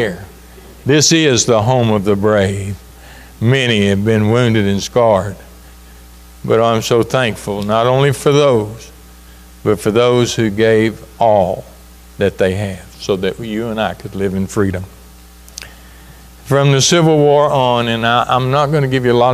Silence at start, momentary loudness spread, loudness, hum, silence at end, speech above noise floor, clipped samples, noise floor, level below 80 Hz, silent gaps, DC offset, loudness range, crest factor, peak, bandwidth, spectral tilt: 0 s; 15 LU; -14 LUFS; none; 0 s; 26 dB; under 0.1%; -39 dBFS; -40 dBFS; none; under 0.1%; 6 LU; 14 dB; 0 dBFS; 15.5 kHz; -5 dB/octave